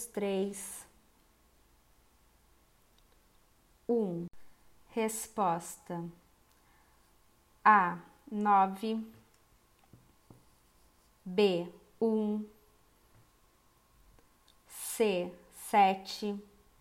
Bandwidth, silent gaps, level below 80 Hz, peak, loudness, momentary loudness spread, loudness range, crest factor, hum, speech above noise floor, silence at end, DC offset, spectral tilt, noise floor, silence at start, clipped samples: 16 kHz; none; -70 dBFS; -10 dBFS; -32 LUFS; 19 LU; 10 LU; 24 dB; none; 36 dB; 0.4 s; under 0.1%; -4.5 dB/octave; -67 dBFS; 0 s; under 0.1%